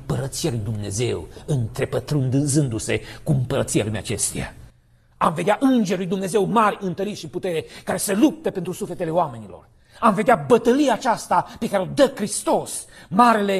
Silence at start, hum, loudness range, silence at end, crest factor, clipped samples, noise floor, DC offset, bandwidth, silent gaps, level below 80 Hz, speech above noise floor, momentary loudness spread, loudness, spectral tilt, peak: 0 s; none; 4 LU; 0 s; 18 dB; under 0.1%; -55 dBFS; under 0.1%; 14 kHz; none; -48 dBFS; 34 dB; 11 LU; -22 LUFS; -5.5 dB/octave; -2 dBFS